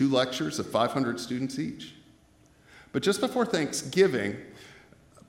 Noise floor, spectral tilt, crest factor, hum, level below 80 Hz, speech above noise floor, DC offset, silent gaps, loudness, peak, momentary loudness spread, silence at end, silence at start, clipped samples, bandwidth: -60 dBFS; -4.5 dB/octave; 20 dB; none; -66 dBFS; 32 dB; under 0.1%; none; -28 LUFS; -10 dBFS; 18 LU; 0.5 s; 0 s; under 0.1%; 16 kHz